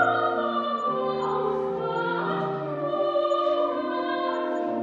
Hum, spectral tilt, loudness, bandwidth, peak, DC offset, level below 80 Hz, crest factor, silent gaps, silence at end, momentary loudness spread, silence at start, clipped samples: none; -7 dB/octave; -26 LUFS; 7.4 kHz; -10 dBFS; under 0.1%; -68 dBFS; 16 dB; none; 0 s; 4 LU; 0 s; under 0.1%